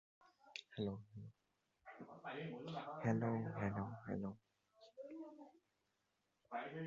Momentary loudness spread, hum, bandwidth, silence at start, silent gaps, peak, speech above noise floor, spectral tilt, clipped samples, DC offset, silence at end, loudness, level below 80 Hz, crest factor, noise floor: 21 LU; none; 7.4 kHz; 0.2 s; none; -26 dBFS; 42 dB; -6.5 dB/octave; under 0.1%; under 0.1%; 0 s; -46 LUFS; -74 dBFS; 22 dB; -86 dBFS